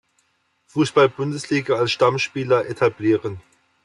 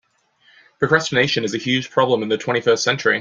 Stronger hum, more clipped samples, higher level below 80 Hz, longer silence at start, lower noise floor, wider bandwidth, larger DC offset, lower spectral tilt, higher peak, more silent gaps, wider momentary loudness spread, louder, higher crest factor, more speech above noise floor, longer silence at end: neither; neither; about the same, -64 dBFS vs -60 dBFS; about the same, 0.75 s vs 0.8 s; first, -67 dBFS vs -58 dBFS; first, 11.5 kHz vs 7.8 kHz; neither; first, -5.5 dB/octave vs -4 dB/octave; about the same, -4 dBFS vs -2 dBFS; neither; first, 10 LU vs 4 LU; about the same, -20 LUFS vs -18 LUFS; about the same, 18 dB vs 18 dB; first, 47 dB vs 40 dB; first, 0.45 s vs 0 s